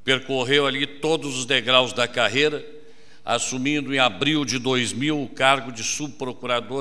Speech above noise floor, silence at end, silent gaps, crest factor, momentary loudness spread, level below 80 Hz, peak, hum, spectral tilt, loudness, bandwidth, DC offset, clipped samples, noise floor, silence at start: 27 dB; 0 s; none; 22 dB; 8 LU; -58 dBFS; -2 dBFS; none; -3 dB/octave; -22 LUFS; 11 kHz; 1%; under 0.1%; -50 dBFS; 0.05 s